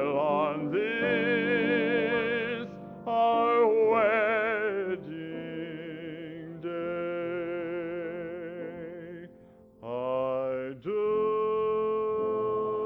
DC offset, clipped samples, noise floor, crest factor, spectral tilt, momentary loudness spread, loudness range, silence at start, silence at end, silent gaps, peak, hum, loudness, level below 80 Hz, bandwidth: under 0.1%; under 0.1%; -54 dBFS; 16 dB; -8 dB/octave; 16 LU; 10 LU; 0 s; 0 s; none; -14 dBFS; none; -29 LUFS; -68 dBFS; 5 kHz